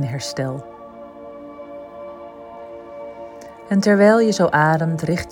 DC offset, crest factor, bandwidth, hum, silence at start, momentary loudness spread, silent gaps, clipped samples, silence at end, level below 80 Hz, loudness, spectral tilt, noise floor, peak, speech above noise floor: under 0.1%; 18 dB; 17 kHz; none; 0 s; 24 LU; none; under 0.1%; 0 s; -52 dBFS; -17 LUFS; -6 dB/octave; -38 dBFS; -2 dBFS; 21 dB